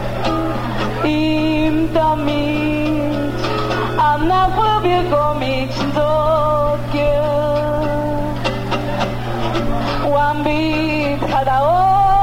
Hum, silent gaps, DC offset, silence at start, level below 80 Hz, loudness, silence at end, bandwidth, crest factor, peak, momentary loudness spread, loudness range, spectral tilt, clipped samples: 60 Hz at -25 dBFS; none; 0.6%; 0 s; -28 dBFS; -17 LUFS; 0 s; 16.5 kHz; 14 dB; -2 dBFS; 6 LU; 3 LU; -7 dB/octave; under 0.1%